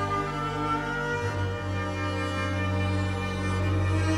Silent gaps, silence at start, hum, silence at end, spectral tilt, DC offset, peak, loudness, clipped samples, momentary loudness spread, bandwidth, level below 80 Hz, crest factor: none; 0 s; none; 0 s; -6 dB/octave; under 0.1%; -14 dBFS; -28 LUFS; under 0.1%; 3 LU; 11 kHz; -46 dBFS; 12 dB